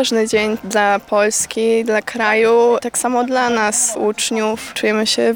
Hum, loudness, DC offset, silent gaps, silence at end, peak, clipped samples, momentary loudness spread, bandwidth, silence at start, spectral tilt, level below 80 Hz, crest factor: none; -16 LUFS; under 0.1%; none; 0 s; -2 dBFS; under 0.1%; 5 LU; 18.5 kHz; 0 s; -2 dB/octave; -54 dBFS; 14 dB